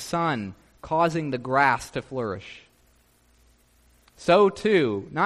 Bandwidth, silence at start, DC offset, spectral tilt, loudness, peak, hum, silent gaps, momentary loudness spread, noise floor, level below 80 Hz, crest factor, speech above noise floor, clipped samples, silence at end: 13.5 kHz; 0 s; under 0.1%; -5.5 dB/octave; -24 LUFS; -6 dBFS; 60 Hz at -60 dBFS; none; 13 LU; -61 dBFS; -58 dBFS; 18 dB; 38 dB; under 0.1%; 0 s